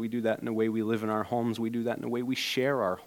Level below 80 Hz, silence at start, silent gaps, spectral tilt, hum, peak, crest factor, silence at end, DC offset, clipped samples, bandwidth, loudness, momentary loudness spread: -72 dBFS; 0 s; none; -5.5 dB/octave; none; -16 dBFS; 14 dB; 0 s; under 0.1%; under 0.1%; 17 kHz; -30 LUFS; 4 LU